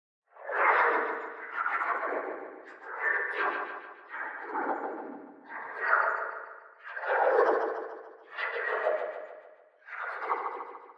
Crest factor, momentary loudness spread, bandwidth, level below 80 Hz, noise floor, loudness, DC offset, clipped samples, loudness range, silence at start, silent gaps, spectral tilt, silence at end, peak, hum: 22 dB; 19 LU; 7.4 kHz; under -90 dBFS; -55 dBFS; -30 LUFS; under 0.1%; under 0.1%; 4 LU; 0.35 s; none; -4 dB/octave; 0.05 s; -10 dBFS; none